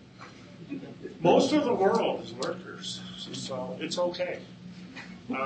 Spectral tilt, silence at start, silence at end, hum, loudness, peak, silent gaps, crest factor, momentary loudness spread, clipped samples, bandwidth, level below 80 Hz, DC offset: -5 dB/octave; 0 s; 0 s; none; -29 LUFS; -10 dBFS; none; 20 dB; 22 LU; under 0.1%; 8.8 kHz; -68 dBFS; under 0.1%